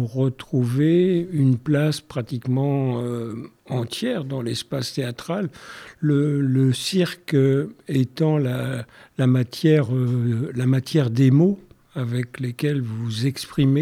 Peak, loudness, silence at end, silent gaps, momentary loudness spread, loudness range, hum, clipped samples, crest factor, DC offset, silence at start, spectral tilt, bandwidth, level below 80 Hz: -6 dBFS; -22 LUFS; 0 s; none; 11 LU; 5 LU; none; under 0.1%; 14 dB; under 0.1%; 0 s; -7 dB/octave; 14.5 kHz; -60 dBFS